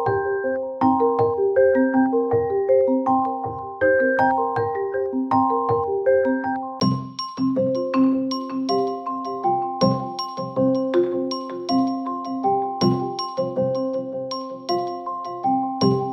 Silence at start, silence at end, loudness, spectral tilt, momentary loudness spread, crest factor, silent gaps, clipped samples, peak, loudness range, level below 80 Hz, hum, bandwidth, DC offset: 0 s; 0 s; -22 LUFS; -7 dB/octave; 9 LU; 16 dB; none; under 0.1%; -6 dBFS; 4 LU; -62 dBFS; none; 6.8 kHz; under 0.1%